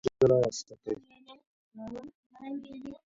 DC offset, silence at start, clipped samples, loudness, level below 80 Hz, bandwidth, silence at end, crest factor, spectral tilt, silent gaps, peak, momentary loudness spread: under 0.1%; 0.05 s; under 0.1%; -30 LUFS; -62 dBFS; 7.8 kHz; 0.15 s; 20 dB; -6 dB/octave; 1.47-1.71 s, 2.15-2.30 s; -12 dBFS; 22 LU